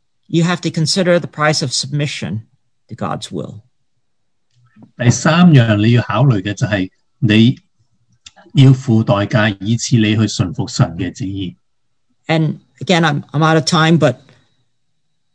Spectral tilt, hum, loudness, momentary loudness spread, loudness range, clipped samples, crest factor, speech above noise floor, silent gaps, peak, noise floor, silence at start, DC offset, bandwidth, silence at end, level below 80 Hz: -5.5 dB/octave; none; -14 LUFS; 15 LU; 7 LU; 0.1%; 16 dB; 61 dB; none; 0 dBFS; -74 dBFS; 0.3 s; under 0.1%; 10 kHz; 1.2 s; -50 dBFS